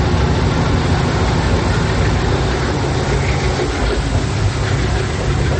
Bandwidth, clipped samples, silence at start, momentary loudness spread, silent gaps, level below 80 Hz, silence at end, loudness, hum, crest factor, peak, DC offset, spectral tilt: 8.8 kHz; under 0.1%; 0 s; 2 LU; none; -22 dBFS; 0 s; -17 LUFS; none; 12 dB; -4 dBFS; under 0.1%; -6 dB/octave